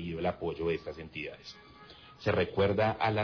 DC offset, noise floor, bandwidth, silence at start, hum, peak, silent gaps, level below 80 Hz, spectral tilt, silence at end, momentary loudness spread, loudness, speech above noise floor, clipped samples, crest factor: under 0.1%; -53 dBFS; 5.4 kHz; 0 s; none; -18 dBFS; none; -56 dBFS; -7.5 dB/octave; 0 s; 23 LU; -32 LUFS; 22 dB; under 0.1%; 14 dB